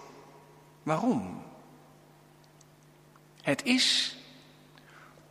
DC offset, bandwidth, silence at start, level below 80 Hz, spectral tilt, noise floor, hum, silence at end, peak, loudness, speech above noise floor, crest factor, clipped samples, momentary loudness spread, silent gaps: under 0.1%; 15 kHz; 0 s; -74 dBFS; -3 dB/octave; -58 dBFS; none; 0.25 s; -10 dBFS; -28 LUFS; 30 dB; 24 dB; under 0.1%; 27 LU; none